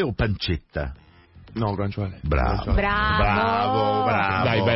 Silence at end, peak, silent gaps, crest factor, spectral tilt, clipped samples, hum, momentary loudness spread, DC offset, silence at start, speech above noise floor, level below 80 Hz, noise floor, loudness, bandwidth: 0 s; -10 dBFS; none; 14 dB; -10 dB/octave; under 0.1%; none; 9 LU; under 0.1%; 0 s; 26 dB; -32 dBFS; -49 dBFS; -23 LUFS; 5.8 kHz